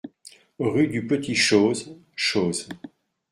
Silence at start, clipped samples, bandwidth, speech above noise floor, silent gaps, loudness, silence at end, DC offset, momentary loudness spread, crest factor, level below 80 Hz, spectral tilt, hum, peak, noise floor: 0.05 s; under 0.1%; 13.5 kHz; 28 dB; none; -23 LUFS; 0.45 s; under 0.1%; 20 LU; 20 dB; -62 dBFS; -4 dB/octave; none; -6 dBFS; -51 dBFS